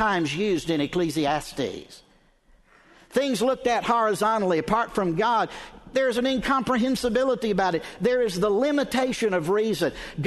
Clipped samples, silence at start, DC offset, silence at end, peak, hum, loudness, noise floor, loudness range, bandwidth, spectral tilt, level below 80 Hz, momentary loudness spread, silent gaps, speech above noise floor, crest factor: under 0.1%; 0 s; under 0.1%; 0 s; -8 dBFS; none; -24 LUFS; -59 dBFS; 4 LU; 12.5 kHz; -5 dB/octave; -50 dBFS; 5 LU; none; 35 dB; 18 dB